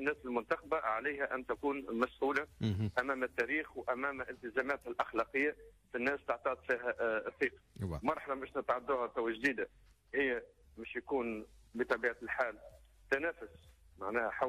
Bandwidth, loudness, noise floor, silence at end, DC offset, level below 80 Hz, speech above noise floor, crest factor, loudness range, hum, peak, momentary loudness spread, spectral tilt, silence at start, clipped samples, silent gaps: 15 kHz; -37 LUFS; -61 dBFS; 0 s; under 0.1%; -62 dBFS; 24 dB; 16 dB; 2 LU; none; -20 dBFS; 9 LU; -6.5 dB/octave; 0 s; under 0.1%; none